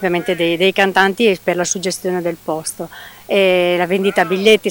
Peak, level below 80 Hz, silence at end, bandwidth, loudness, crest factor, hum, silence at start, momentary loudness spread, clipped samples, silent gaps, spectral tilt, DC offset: 0 dBFS; -56 dBFS; 0 s; 19 kHz; -15 LUFS; 16 dB; none; 0 s; 10 LU; under 0.1%; none; -3.5 dB/octave; under 0.1%